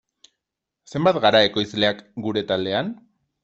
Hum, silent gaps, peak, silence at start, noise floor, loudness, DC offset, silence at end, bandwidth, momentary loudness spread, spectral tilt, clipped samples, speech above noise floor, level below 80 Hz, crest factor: none; none; -2 dBFS; 0.95 s; -83 dBFS; -21 LUFS; under 0.1%; 0.45 s; 8 kHz; 15 LU; -5.5 dB/octave; under 0.1%; 63 dB; -60 dBFS; 20 dB